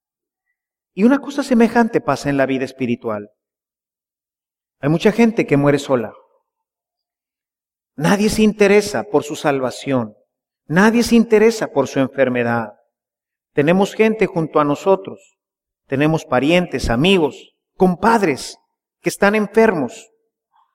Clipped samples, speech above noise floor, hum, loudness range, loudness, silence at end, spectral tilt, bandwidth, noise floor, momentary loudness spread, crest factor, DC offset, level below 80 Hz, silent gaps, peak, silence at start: under 0.1%; over 74 dB; none; 3 LU; -17 LUFS; 0.75 s; -6 dB/octave; 16 kHz; under -90 dBFS; 10 LU; 16 dB; under 0.1%; -44 dBFS; none; -2 dBFS; 0.95 s